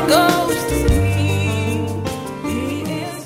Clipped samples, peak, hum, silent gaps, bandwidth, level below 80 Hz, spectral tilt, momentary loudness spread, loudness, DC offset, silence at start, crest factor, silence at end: under 0.1%; -2 dBFS; none; none; 16 kHz; -30 dBFS; -5.5 dB/octave; 10 LU; -19 LUFS; under 0.1%; 0 s; 16 dB; 0 s